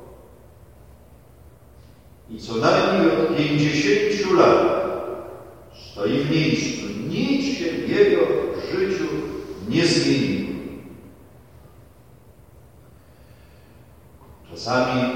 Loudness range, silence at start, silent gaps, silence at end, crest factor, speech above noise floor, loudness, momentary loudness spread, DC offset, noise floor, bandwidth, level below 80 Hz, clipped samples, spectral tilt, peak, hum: 8 LU; 0 s; none; 0 s; 20 dB; 30 dB; -21 LUFS; 19 LU; 0.2%; -50 dBFS; 16 kHz; -52 dBFS; under 0.1%; -5.5 dB/octave; -2 dBFS; none